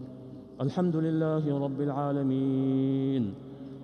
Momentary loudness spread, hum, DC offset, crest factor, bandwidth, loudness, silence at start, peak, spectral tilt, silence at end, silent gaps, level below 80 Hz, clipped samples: 16 LU; none; under 0.1%; 12 dB; 6.4 kHz; -29 LUFS; 0 s; -16 dBFS; -10 dB/octave; 0 s; none; -66 dBFS; under 0.1%